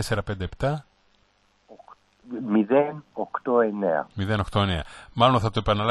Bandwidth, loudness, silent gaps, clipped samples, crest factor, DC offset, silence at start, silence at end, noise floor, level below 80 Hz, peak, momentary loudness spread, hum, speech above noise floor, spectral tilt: 12 kHz; -24 LUFS; none; under 0.1%; 20 dB; under 0.1%; 0 s; 0 s; -64 dBFS; -44 dBFS; -4 dBFS; 13 LU; 50 Hz at -50 dBFS; 40 dB; -6.5 dB/octave